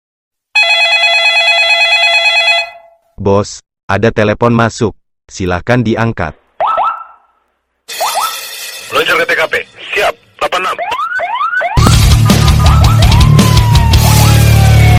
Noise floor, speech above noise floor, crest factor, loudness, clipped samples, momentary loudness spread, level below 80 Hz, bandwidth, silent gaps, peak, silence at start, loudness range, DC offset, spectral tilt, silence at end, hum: -62 dBFS; 50 dB; 10 dB; -9 LUFS; 2%; 11 LU; -18 dBFS; 16.5 kHz; 3.83-3.88 s; 0 dBFS; 0.55 s; 8 LU; under 0.1%; -4.5 dB/octave; 0 s; none